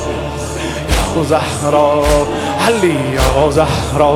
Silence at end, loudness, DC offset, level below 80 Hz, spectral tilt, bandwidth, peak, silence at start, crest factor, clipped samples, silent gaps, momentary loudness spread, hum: 0 s; -14 LUFS; under 0.1%; -24 dBFS; -5 dB/octave; 16.5 kHz; 0 dBFS; 0 s; 14 dB; under 0.1%; none; 8 LU; none